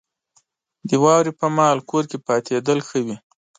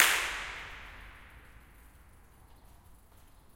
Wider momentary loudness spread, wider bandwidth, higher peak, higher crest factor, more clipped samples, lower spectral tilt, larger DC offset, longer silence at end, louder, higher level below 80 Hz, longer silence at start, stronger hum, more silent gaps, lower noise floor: second, 11 LU vs 28 LU; second, 9.6 kHz vs 16.5 kHz; about the same, -2 dBFS vs -2 dBFS; second, 18 dB vs 34 dB; neither; first, -5.5 dB/octave vs 0.5 dB/octave; neither; second, 0.4 s vs 0.65 s; first, -19 LUFS vs -32 LUFS; second, -68 dBFS vs -56 dBFS; first, 0.85 s vs 0 s; neither; neither; first, -64 dBFS vs -57 dBFS